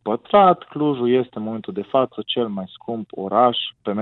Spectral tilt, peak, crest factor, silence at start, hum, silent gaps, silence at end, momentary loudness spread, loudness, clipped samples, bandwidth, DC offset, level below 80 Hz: -9.5 dB/octave; -4 dBFS; 18 dB; 0.05 s; none; none; 0 s; 14 LU; -20 LUFS; under 0.1%; 4.2 kHz; under 0.1%; -64 dBFS